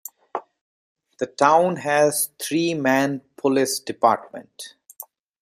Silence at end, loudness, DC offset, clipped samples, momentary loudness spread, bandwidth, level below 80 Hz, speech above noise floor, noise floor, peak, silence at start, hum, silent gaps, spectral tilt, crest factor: 0.4 s; -21 LUFS; under 0.1%; under 0.1%; 22 LU; 16 kHz; -70 dBFS; 24 dB; -45 dBFS; -2 dBFS; 0.35 s; none; 0.61-0.96 s; -4 dB/octave; 22 dB